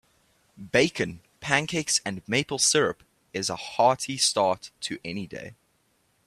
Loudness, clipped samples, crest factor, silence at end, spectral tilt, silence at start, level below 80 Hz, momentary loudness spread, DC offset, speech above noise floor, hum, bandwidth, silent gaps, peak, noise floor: -25 LUFS; under 0.1%; 24 dB; 0.75 s; -2.5 dB/octave; 0.6 s; -62 dBFS; 15 LU; under 0.1%; 42 dB; none; 15 kHz; none; -4 dBFS; -69 dBFS